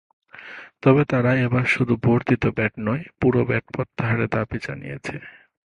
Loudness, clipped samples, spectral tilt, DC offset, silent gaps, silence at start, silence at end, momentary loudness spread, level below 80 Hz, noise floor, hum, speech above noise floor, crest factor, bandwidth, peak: -22 LUFS; under 0.1%; -8 dB/octave; under 0.1%; none; 0.35 s; 0.45 s; 15 LU; -48 dBFS; -41 dBFS; none; 20 dB; 20 dB; 10 kHz; -2 dBFS